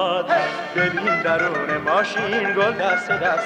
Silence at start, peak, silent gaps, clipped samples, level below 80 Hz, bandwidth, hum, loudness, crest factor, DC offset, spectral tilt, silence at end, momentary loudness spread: 0 s; -6 dBFS; none; under 0.1%; -58 dBFS; 10 kHz; none; -20 LUFS; 14 dB; under 0.1%; -4.5 dB/octave; 0 s; 2 LU